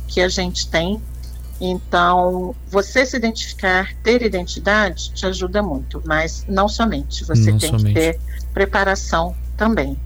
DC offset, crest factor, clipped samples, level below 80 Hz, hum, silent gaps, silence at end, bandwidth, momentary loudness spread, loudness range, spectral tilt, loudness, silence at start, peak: under 0.1%; 14 dB; under 0.1%; -28 dBFS; none; none; 0 s; over 20 kHz; 9 LU; 1 LU; -5 dB/octave; -19 LUFS; 0 s; -4 dBFS